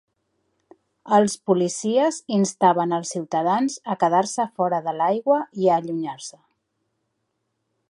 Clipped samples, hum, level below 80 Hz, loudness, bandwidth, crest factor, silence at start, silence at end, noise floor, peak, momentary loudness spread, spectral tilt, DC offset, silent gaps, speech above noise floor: under 0.1%; none; -72 dBFS; -22 LUFS; 11.5 kHz; 20 dB; 1.05 s; 1.6 s; -75 dBFS; -4 dBFS; 7 LU; -5 dB/octave; under 0.1%; none; 54 dB